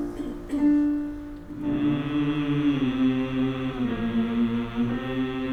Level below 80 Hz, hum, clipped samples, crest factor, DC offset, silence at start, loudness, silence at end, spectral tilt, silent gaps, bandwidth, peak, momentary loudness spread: -44 dBFS; none; under 0.1%; 12 dB; under 0.1%; 0 s; -26 LUFS; 0 s; -8 dB/octave; none; 8.4 kHz; -12 dBFS; 9 LU